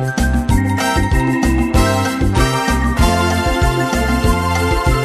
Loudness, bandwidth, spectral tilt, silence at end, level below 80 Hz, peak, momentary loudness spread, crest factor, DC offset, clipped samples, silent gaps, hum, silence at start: -15 LUFS; 14 kHz; -5.5 dB/octave; 0 s; -20 dBFS; -2 dBFS; 2 LU; 12 dB; under 0.1%; under 0.1%; none; none; 0 s